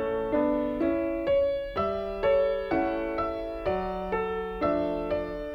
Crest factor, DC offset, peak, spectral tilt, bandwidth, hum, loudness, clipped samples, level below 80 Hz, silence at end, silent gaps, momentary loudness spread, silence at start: 14 dB; under 0.1%; -14 dBFS; -8 dB/octave; 5.8 kHz; none; -28 LUFS; under 0.1%; -46 dBFS; 0 s; none; 5 LU; 0 s